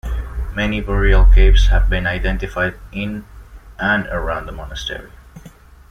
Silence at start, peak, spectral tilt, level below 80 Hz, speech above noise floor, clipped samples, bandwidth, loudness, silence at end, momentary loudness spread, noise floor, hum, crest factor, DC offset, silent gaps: 0.05 s; -2 dBFS; -6 dB/octave; -16 dBFS; 27 dB; under 0.1%; 6.6 kHz; -18 LUFS; 0.4 s; 14 LU; -42 dBFS; none; 14 dB; under 0.1%; none